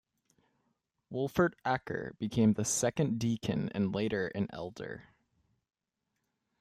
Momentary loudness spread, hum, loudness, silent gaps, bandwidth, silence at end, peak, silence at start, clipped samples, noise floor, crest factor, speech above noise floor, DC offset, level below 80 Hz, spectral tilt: 13 LU; none; -33 LUFS; none; 15 kHz; 1.6 s; -14 dBFS; 1.1 s; under 0.1%; -85 dBFS; 20 dB; 53 dB; under 0.1%; -64 dBFS; -5 dB/octave